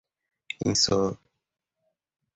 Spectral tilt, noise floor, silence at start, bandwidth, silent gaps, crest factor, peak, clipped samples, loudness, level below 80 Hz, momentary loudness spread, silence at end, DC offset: -3.5 dB/octave; -84 dBFS; 0.6 s; 8.4 kHz; none; 20 dB; -10 dBFS; under 0.1%; -25 LUFS; -56 dBFS; 18 LU; 1.2 s; under 0.1%